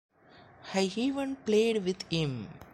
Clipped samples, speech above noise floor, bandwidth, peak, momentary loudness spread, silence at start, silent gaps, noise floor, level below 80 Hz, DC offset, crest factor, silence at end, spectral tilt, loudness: under 0.1%; 27 dB; 12.5 kHz; -14 dBFS; 8 LU; 0.6 s; none; -57 dBFS; -64 dBFS; under 0.1%; 16 dB; 0.1 s; -5.5 dB/octave; -30 LUFS